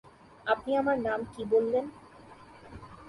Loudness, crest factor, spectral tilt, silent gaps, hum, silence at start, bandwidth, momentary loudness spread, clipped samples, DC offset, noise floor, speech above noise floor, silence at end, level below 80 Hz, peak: -29 LUFS; 18 dB; -6.5 dB/octave; none; none; 0.45 s; 11.5 kHz; 22 LU; under 0.1%; under 0.1%; -52 dBFS; 23 dB; 0 s; -60 dBFS; -14 dBFS